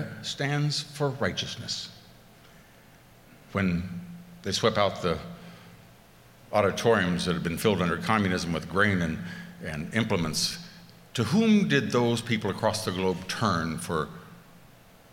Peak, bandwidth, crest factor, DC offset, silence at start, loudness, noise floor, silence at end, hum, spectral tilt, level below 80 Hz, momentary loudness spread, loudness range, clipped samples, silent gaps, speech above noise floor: -8 dBFS; 17 kHz; 22 dB; under 0.1%; 0 s; -27 LUFS; -54 dBFS; 0.45 s; none; -5 dB/octave; -54 dBFS; 15 LU; 6 LU; under 0.1%; none; 27 dB